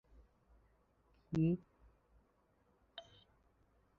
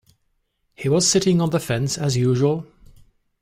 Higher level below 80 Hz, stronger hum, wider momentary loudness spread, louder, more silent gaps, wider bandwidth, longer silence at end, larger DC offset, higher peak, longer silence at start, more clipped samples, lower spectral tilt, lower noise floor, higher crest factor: second, -68 dBFS vs -52 dBFS; neither; first, 20 LU vs 7 LU; second, -38 LUFS vs -20 LUFS; neither; second, 6.8 kHz vs 16 kHz; first, 0.95 s vs 0.8 s; neither; second, -26 dBFS vs -6 dBFS; first, 1.3 s vs 0.8 s; neither; first, -8.5 dB/octave vs -5 dB/octave; first, -75 dBFS vs -69 dBFS; about the same, 20 dB vs 16 dB